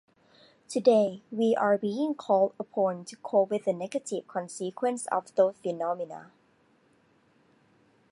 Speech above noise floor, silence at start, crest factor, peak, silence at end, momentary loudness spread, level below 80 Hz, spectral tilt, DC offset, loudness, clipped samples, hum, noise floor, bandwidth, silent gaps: 38 dB; 0.7 s; 20 dB; -8 dBFS; 1.9 s; 11 LU; -82 dBFS; -5.5 dB/octave; under 0.1%; -28 LUFS; under 0.1%; none; -65 dBFS; 11.5 kHz; none